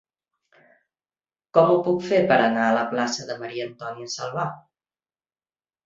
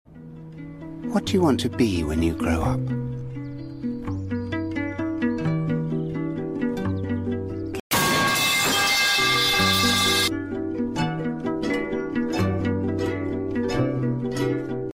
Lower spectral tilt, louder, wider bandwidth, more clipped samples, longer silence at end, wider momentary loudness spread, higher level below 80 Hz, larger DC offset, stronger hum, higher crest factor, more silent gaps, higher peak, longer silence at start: about the same, -5 dB/octave vs -4 dB/octave; about the same, -22 LUFS vs -23 LUFS; second, 7.8 kHz vs 16 kHz; neither; first, 1.25 s vs 0 s; about the same, 13 LU vs 13 LU; second, -68 dBFS vs -44 dBFS; neither; neither; first, 22 dB vs 16 dB; second, none vs 7.80-7.90 s; first, -2 dBFS vs -8 dBFS; first, 1.55 s vs 0.1 s